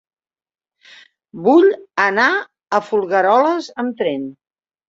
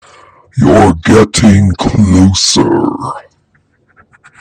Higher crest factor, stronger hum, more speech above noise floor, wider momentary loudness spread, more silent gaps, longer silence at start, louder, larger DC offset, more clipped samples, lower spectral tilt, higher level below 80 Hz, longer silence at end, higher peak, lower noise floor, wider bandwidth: first, 18 dB vs 10 dB; neither; second, 31 dB vs 46 dB; second, 10 LU vs 14 LU; neither; first, 1.35 s vs 0.55 s; second, -16 LUFS vs -8 LUFS; neither; neither; about the same, -5 dB/octave vs -5 dB/octave; second, -66 dBFS vs -30 dBFS; second, 0.55 s vs 1.2 s; about the same, 0 dBFS vs 0 dBFS; second, -47 dBFS vs -54 dBFS; second, 7.6 kHz vs 10.5 kHz